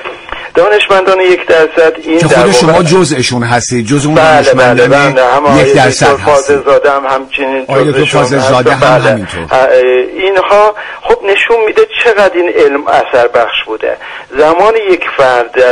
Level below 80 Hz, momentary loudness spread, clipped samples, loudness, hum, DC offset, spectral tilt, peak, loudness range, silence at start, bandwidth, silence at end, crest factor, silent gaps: -38 dBFS; 7 LU; 0.7%; -7 LUFS; none; under 0.1%; -4.5 dB/octave; 0 dBFS; 2 LU; 0 s; 11 kHz; 0 s; 8 dB; none